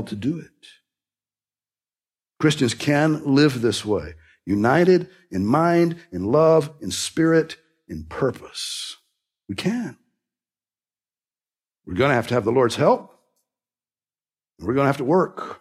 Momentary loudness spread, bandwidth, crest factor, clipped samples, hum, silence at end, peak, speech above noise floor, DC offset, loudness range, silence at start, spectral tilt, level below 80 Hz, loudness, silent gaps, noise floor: 15 LU; 14.5 kHz; 18 dB; under 0.1%; none; 0.05 s; -4 dBFS; over 69 dB; under 0.1%; 10 LU; 0 s; -5.5 dB/octave; -56 dBFS; -21 LUFS; none; under -90 dBFS